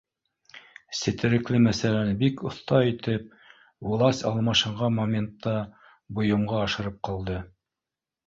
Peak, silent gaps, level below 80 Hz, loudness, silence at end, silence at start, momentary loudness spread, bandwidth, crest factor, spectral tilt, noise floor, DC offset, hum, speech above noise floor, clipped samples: -8 dBFS; none; -52 dBFS; -26 LUFS; 0.8 s; 0.55 s; 12 LU; 7.8 kHz; 18 dB; -6 dB/octave; -89 dBFS; under 0.1%; none; 64 dB; under 0.1%